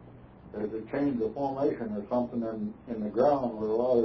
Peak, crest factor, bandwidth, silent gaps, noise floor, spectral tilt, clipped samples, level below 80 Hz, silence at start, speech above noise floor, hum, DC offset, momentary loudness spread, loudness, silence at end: -12 dBFS; 16 dB; 5.4 kHz; none; -50 dBFS; -10 dB/octave; under 0.1%; -58 dBFS; 0 s; 21 dB; none; under 0.1%; 11 LU; -30 LUFS; 0 s